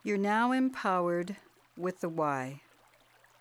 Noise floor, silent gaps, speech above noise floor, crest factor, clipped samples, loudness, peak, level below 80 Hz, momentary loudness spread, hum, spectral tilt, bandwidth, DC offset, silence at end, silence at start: -64 dBFS; none; 33 dB; 16 dB; under 0.1%; -31 LUFS; -16 dBFS; -78 dBFS; 14 LU; none; -6.5 dB/octave; 15.5 kHz; under 0.1%; 0.85 s; 0.05 s